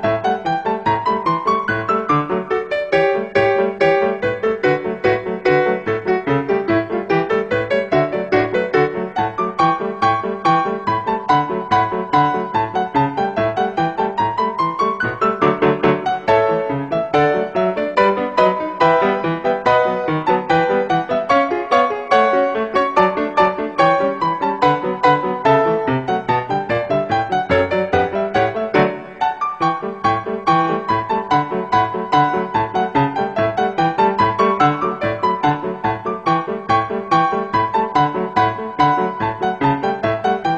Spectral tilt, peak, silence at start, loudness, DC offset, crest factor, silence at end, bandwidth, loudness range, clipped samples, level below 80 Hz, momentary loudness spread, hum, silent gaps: -7 dB/octave; 0 dBFS; 0 s; -17 LUFS; 0.1%; 16 dB; 0 s; 8.6 kHz; 2 LU; under 0.1%; -50 dBFS; 4 LU; none; none